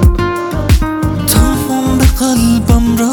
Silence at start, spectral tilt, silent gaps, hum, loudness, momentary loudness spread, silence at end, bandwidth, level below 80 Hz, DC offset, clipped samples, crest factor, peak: 0 s; -5.5 dB/octave; none; none; -12 LUFS; 5 LU; 0 s; over 20 kHz; -16 dBFS; under 0.1%; under 0.1%; 10 dB; 0 dBFS